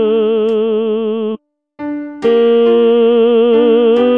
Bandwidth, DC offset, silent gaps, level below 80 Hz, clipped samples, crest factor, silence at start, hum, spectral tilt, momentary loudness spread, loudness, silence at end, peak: 4 kHz; 0.3%; none; -62 dBFS; under 0.1%; 10 dB; 0 s; none; -7.5 dB/octave; 13 LU; -12 LUFS; 0 s; 0 dBFS